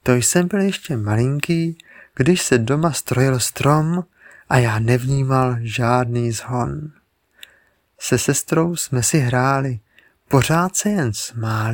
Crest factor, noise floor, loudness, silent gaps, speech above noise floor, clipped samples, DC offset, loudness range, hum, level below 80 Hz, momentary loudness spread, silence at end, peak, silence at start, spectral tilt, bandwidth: 18 dB; -58 dBFS; -19 LUFS; none; 40 dB; under 0.1%; under 0.1%; 3 LU; none; -46 dBFS; 9 LU; 0 s; 0 dBFS; 0.05 s; -5 dB/octave; 17.5 kHz